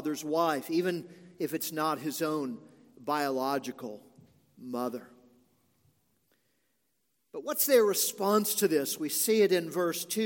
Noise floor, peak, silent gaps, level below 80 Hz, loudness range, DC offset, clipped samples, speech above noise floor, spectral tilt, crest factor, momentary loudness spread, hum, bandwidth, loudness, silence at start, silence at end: -78 dBFS; -10 dBFS; none; -84 dBFS; 16 LU; under 0.1%; under 0.1%; 49 dB; -3.5 dB/octave; 20 dB; 17 LU; none; 17 kHz; -29 LUFS; 0 s; 0 s